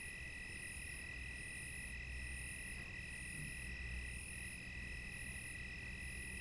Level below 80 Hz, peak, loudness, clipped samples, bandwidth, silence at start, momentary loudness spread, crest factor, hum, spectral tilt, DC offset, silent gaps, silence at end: -54 dBFS; -34 dBFS; -47 LUFS; under 0.1%; 11.5 kHz; 0 s; 1 LU; 14 dB; none; -3 dB/octave; under 0.1%; none; 0 s